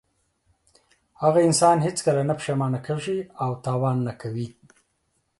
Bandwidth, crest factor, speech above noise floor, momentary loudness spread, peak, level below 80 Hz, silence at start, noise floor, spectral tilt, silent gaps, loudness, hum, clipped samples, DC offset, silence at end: 11.5 kHz; 18 dB; 49 dB; 13 LU; -6 dBFS; -62 dBFS; 1.2 s; -72 dBFS; -5.5 dB/octave; none; -23 LUFS; none; under 0.1%; under 0.1%; 0.9 s